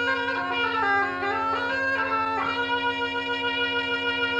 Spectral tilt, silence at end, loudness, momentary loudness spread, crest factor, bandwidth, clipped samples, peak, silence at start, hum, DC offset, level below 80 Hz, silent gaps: -4 dB/octave; 0 s; -25 LUFS; 3 LU; 12 dB; 10 kHz; under 0.1%; -14 dBFS; 0 s; none; under 0.1%; -60 dBFS; none